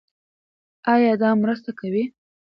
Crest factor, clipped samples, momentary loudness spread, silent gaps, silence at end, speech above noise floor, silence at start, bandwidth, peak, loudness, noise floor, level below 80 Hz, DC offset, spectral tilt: 18 dB; under 0.1%; 11 LU; none; 0.45 s; over 70 dB; 0.85 s; 5.6 kHz; -4 dBFS; -21 LUFS; under -90 dBFS; -68 dBFS; under 0.1%; -9.5 dB/octave